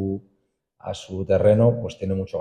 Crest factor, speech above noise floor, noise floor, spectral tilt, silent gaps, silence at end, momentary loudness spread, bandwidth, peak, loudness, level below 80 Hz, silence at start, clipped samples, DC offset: 18 dB; 49 dB; -70 dBFS; -8 dB/octave; none; 0 s; 17 LU; 9.2 kHz; -6 dBFS; -21 LUFS; -52 dBFS; 0 s; under 0.1%; under 0.1%